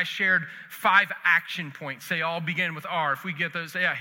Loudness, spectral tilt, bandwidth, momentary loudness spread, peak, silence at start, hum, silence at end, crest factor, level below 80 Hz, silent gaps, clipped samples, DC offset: -25 LUFS; -4 dB/octave; 17 kHz; 13 LU; -4 dBFS; 0 s; none; 0 s; 22 dB; -84 dBFS; none; under 0.1%; under 0.1%